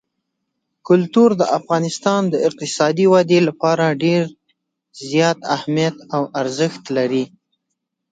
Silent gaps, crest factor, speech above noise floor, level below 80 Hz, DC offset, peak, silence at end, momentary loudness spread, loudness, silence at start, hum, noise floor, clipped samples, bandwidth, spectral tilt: none; 18 dB; 60 dB; -66 dBFS; under 0.1%; 0 dBFS; 0.85 s; 9 LU; -17 LUFS; 0.85 s; none; -77 dBFS; under 0.1%; 9.4 kHz; -5.5 dB/octave